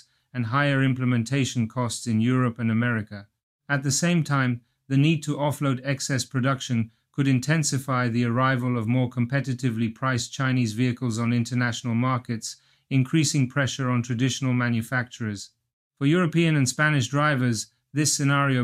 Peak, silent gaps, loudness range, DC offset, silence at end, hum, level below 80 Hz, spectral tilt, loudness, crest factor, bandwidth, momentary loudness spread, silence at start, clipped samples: -8 dBFS; 3.43-3.59 s, 15.73-15.90 s; 1 LU; under 0.1%; 0 s; none; -64 dBFS; -5 dB/octave; -24 LUFS; 16 dB; 14.5 kHz; 7 LU; 0.35 s; under 0.1%